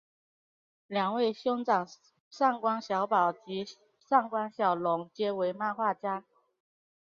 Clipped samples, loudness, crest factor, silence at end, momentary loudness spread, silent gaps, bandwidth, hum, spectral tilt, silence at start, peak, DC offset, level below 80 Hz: under 0.1%; -30 LUFS; 20 dB; 0.9 s; 10 LU; 2.20-2.31 s; 7.2 kHz; none; -6 dB/octave; 0.9 s; -12 dBFS; under 0.1%; -82 dBFS